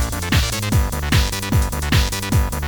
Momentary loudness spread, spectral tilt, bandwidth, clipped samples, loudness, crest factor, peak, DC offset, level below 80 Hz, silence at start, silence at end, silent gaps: 2 LU; -4.5 dB/octave; over 20 kHz; under 0.1%; -19 LUFS; 16 dB; -2 dBFS; under 0.1%; -22 dBFS; 0 s; 0 s; none